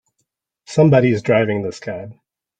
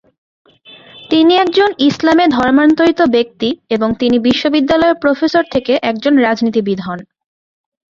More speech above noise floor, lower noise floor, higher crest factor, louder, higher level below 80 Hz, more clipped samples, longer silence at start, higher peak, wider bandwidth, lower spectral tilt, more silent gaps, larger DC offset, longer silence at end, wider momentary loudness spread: first, 57 dB vs 29 dB; first, -73 dBFS vs -41 dBFS; about the same, 16 dB vs 12 dB; second, -16 LUFS vs -12 LUFS; second, -54 dBFS vs -48 dBFS; neither; second, 0.7 s vs 0.95 s; about the same, -2 dBFS vs -2 dBFS; first, 9 kHz vs 7.4 kHz; first, -7.5 dB/octave vs -5.5 dB/octave; neither; neither; second, 0.45 s vs 0.9 s; first, 17 LU vs 7 LU